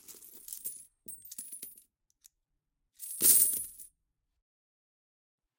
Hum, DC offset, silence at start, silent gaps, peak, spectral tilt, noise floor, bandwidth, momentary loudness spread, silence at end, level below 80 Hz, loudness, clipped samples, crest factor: none; under 0.1%; 0.1 s; none; -8 dBFS; 0.5 dB/octave; -83 dBFS; 17 kHz; 26 LU; 1.7 s; -76 dBFS; -25 LUFS; under 0.1%; 28 dB